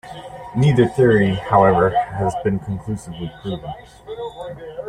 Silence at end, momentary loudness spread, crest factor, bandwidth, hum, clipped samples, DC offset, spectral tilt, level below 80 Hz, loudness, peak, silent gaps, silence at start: 0 s; 19 LU; 18 dB; 11 kHz; none; under 0.1%; under 0.1%; -7.5 dB/octave; -44 dBFS; -18 LUFS; -2 dBFS; none; 0.05 s